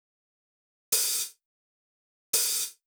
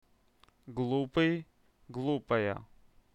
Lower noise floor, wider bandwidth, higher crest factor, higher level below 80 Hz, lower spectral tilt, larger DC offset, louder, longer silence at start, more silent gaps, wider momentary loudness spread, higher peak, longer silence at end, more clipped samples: first, under -90 dBFS vs -66 dBFS; first, over 20 kHz vs 8.6 kHz; about the same, 22 dB vs 20 dB; second, -80 dBFS vs -62 dBFS; second, 3 dB/octave vs -7.5 dB/octave; neither; first, -26 LUFS vs -33 LUFS; first, 0.9 s vs 0.65 s; first, 1.45-2.33 s vs none; second, 6 LU vs 14 LU; first, -12 dBFS vs -16 dBFS; second, 0.15 s vs 0.5 s; neither